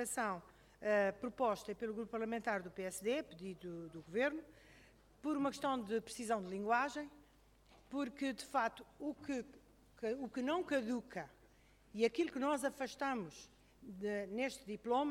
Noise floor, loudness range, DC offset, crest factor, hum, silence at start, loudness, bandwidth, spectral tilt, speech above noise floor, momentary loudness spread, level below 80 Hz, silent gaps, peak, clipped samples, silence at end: -68 dBFS; 3 LU; under 0.1%; 20 dB; 50 Hz at -70 dBFS; 0 s; -41 LUFS; 16.5 kHz; -4.5 dB/octave; 28 dB; 13 LU; -72 dBFS; none; -20 dBFS; under 0.1%; 0 s